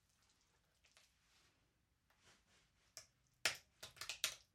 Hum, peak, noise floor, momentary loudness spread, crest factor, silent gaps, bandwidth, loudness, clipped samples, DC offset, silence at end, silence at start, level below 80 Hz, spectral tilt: none; -20 dBFS; -82 dBFS; 18 LU; 34 dB; none; 16 kHz; -45 LUFS; under 0.1%; under 0.1%; 0.15 s; 0.95 s; -84 dBFS; 1 dB/octave